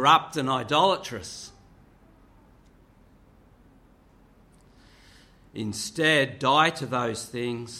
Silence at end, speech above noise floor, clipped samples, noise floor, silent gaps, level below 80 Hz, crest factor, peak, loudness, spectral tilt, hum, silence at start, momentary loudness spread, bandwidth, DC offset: 0 s; 32 dB; under 0.1%; -57 dBFS; none; -60 dBFS; 24 dB; -4 dBFS; -24 LUFS; -3.5 dB/octave; none; 0 s; 17 LU; 16 kHz; under 0.1%